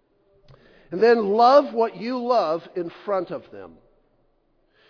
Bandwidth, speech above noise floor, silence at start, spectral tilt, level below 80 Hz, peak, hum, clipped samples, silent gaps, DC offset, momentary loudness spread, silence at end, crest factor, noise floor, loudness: 5.4 kHz; 44 dB; 0.9 s; -6 dB/octave; -66 dBFS; -2 dBFS; none; under 0.1%; none; under 0.1%; 18 LU; 1.2 s; 20 dB; -65 dBFS; -21 LUFS